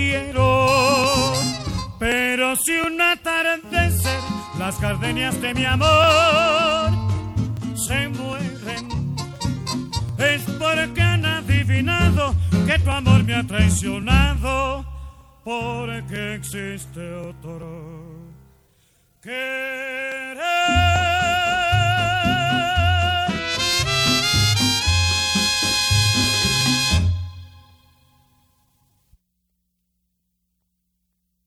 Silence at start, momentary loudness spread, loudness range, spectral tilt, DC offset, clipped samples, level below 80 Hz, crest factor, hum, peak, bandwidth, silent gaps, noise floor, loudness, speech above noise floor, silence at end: 0 s; 12 LU; 12 LU; -4 dB/octave; under 0.1%; under 0.1%; -34 dBFS; 18 dB; none; -2 dBFS; 16.5 kHz; none; -73 dBFS; -19 LUFS; 53 dB; 3.9 s